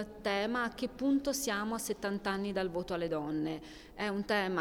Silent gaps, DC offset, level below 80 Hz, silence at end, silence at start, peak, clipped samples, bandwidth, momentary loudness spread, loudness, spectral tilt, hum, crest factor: none; under 0.1%; -58 dBFS; 0 s; 0 s; -18 dBFS; under 0.1%; 18 kHz; 5 LU; -35 LUFS; -4 dB/octave; none; 16 dB